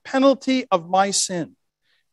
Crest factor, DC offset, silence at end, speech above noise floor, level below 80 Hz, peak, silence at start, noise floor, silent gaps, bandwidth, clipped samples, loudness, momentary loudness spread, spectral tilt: 18 dB; under 0.1%; 0.65 s; 49 dB; -72 dBFS; -4 dBFS; 0.05 s; -69 dBFS; none; 12 kHz; under 0.1%; -20 LUFS; 10 LU; -3 dB/octave